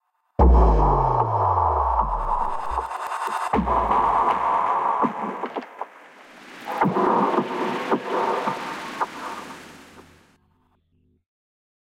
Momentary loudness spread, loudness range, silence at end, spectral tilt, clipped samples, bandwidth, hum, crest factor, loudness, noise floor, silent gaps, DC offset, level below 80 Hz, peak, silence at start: 15 LU; 9 LU; 2 s; -7 dB/octave; under 0.1%; 12 kHz; none; 18 dB; -22 LUFS; -65 dBFS; none; under 0.1%; -28 dBFS; -4 dBFS; 0.4 s